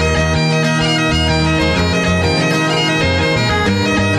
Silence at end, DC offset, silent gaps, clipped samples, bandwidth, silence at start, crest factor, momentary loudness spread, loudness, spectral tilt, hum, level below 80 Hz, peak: 0 s; under 0.1%; none; under 0.1%; 13.5 kHz; 0 s; 10 dB; 1 LU; -14 LUFS; -5 dB/octave; none; -28 dBFS; -4 dBFS